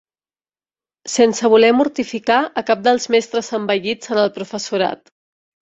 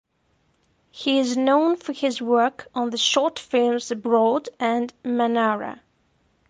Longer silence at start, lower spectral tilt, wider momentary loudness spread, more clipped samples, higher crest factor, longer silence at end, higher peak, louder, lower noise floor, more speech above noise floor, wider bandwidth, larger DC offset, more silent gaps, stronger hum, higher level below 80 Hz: about the same, 1.05 s vs 0.95 s; about the same, -3.5 dB/octave vs -3 dB/octave; first, 10 LU vs 7 LU; neither; about the same, 16 dB vs 16 dB; about the same, 0.8 s vs 0.75 s; first, -2 dBFS vs -6 dBFS; first, -17 LUFS vs -22 LUFS; first, under -90 dBFS vs -67 dBFS; first, over 73 dB vs 45 dB; second, 8.2 kHz vs 10 kHz; neither; neither; neither; first, -62 dBFS vs -70 dBFS